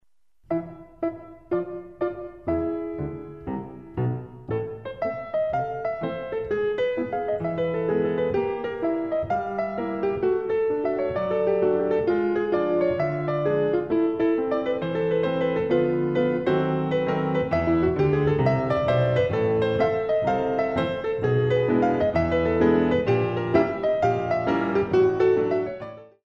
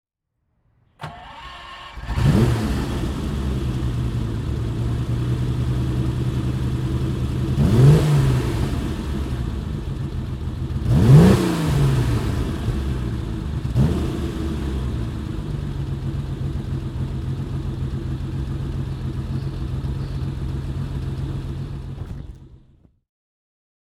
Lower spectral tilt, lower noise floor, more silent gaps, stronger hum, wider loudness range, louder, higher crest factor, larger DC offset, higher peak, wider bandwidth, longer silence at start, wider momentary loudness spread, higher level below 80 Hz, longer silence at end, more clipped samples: first, -9 dB/octave vs -7.5 dB/octave; second, -62 dBFS vs -73 dBFS; neither; neither; about the same, 8 LU vs 9 LU; about the same, -24 LUFS vs -22 LUFS; about the same, 18 dB vs 20 dB; first, 0.1% vs under 0.1%; second, -6 dBFS vs 0 dBFS; second, 7 kHz vs 14 kHz; second, 0.5 s vs 1 s; about the same, 9 LU vs 11 LU; second, -48 dBFS vs -30 dBFS; second, 0.2 s vs 1.25 s; neither